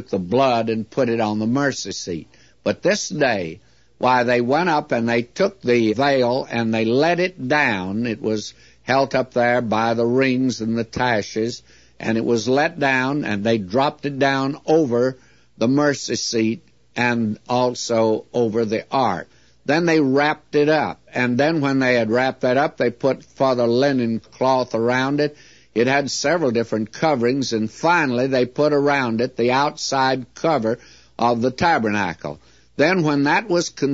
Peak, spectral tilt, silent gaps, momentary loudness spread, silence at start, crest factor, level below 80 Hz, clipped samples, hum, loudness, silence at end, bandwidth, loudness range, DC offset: -4 dBFS; -5 dB/octave; none; 7 LU; 0 s; 16 dB; -56 dBFS; under 0.1%; none; -20 LUFS; 0 s; 8 kHz; 2 LU; 0.2%